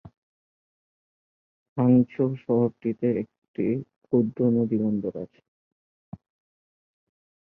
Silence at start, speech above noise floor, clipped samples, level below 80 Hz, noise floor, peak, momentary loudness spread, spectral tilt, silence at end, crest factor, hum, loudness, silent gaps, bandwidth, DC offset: 0.05 s; over 66 dB; under 0.1%; -64 dBFS; under -90 dBFS; -8 dBFS; 14 LU; -12.5 dB/octave; 2.3 s; 18 dB; none; -25 LUFS; 0.17-1.76 s, 3.38-3.42 s, 3.48-3.54 s, 3.96-4.01 s; 3.1 kHz; under 0.1%